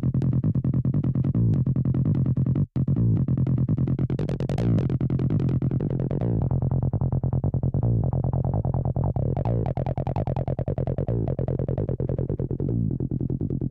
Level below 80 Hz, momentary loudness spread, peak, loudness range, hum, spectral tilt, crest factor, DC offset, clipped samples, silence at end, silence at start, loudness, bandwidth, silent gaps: -38 dBFS; 4 LU; -16 dBFS; 4 LU; none; -11.5 dB/octave; 8 dB; under 0.1%; under 0.1%; 0 s; 0 s; -25 LUFS; 4 kHz; none